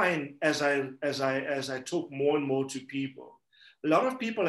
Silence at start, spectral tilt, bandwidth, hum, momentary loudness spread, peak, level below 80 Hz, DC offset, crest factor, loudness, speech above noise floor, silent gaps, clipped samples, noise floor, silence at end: 0 s; -4.5 dB/octave; 12.5 kHz; none; 9 LU; -12 dBFS; -80 dBFS; under 0.1%; 18 dB; -30 LUFS; 31 dB; none; under 0.1%; -60 dBFS; 0 s